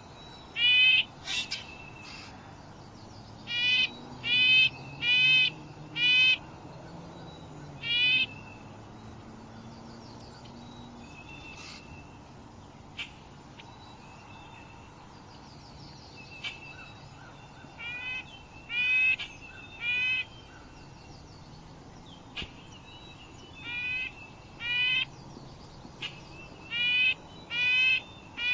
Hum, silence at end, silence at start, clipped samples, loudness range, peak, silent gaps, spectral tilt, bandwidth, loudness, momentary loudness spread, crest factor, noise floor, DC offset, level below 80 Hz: none; 0 s; 0 s; under 0.1%; 22 LU; -12 dBFS; none; -2 dB/octave; 7.8 kHz; -25 LUFS; 27 LU; 20 dB; -50 dBFS; under 0.1%; -58 dBFS